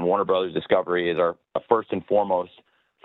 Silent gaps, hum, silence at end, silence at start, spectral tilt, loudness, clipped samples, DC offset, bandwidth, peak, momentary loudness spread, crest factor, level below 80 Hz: none; none; 0.6 s; 0 s; -8.5 dB/octave; -24 LUFS; under 0.1%; under 0.1%; 4.1 kHz; -4 dBFS; 5 LU; 20 dB; -64 dBFS